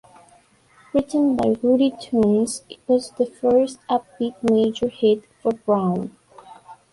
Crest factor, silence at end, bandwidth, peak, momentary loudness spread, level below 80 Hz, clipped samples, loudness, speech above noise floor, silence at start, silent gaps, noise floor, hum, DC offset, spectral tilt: 14 dB; 0.2 s; 11.5 kHz; -6 dBFS; 7 LU; -56 dBFS; under 0.1%; -21 LUFS; 35 dB; 0.95 s; none; -55 dBFS; none; under 0.1%; -6.5 dB/octave